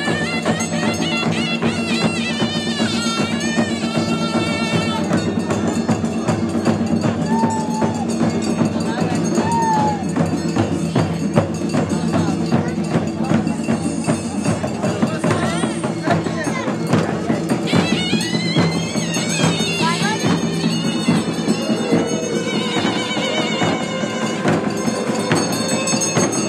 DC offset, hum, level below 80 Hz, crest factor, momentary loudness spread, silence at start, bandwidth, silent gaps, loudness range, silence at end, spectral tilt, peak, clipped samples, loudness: under 0.1%; none; -52 dBFS; 18 dB; 3 LU; 0 s; 13 kHz; none; 2 LU; 0 s; -5 dB/octave; 0 dBFS; under 0.1%; -19 LUFS